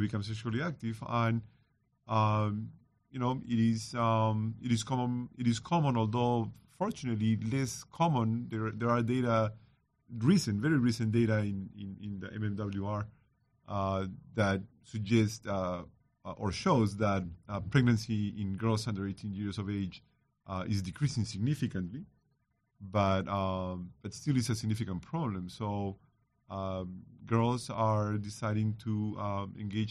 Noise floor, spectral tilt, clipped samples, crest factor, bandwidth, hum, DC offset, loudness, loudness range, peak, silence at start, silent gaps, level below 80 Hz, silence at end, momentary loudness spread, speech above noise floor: -77 dBFS; -6.5 dB/octave; under 0.1%; 20 dB; 12.5 kHz; none; under 0.1%; -33 LUFS; 5 LU; -12 dBFS; 0 s; none; -60 dBFS; 0 s; 12 LU; 45 dB